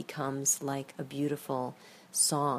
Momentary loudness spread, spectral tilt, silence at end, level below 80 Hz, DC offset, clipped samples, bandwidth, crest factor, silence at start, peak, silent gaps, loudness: 11 LU; -3.5 dB/octave; 0 s; -76 dBFS; under 0.1%; under 0.1%; 15.5 kHz; 18 dB; 0 s; -14 dBFS; none; -32 LUFS